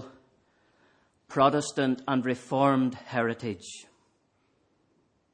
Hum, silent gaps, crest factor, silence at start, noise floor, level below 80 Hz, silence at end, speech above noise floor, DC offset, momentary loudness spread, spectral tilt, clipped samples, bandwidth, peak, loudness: none; none; 22 dB; 0 s; -71 dBFS; -70 dBFS; 1.5 s; 44 dB; under 0.1%; 14 LU; -5.5 dB/octave; under 0.1%; 10 kHz; -8 dBFS; -27 LUFS